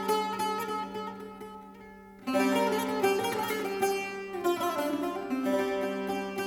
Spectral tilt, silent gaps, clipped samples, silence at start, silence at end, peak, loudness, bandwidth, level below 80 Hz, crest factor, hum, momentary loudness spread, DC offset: -4 dB/octave; none; under 0.1%; 0 s; 0 s; -14 dBFS; -30 LUFS; 19 kHz; -66 dBFS; 18 dB; none; 16 LU; under 0.1%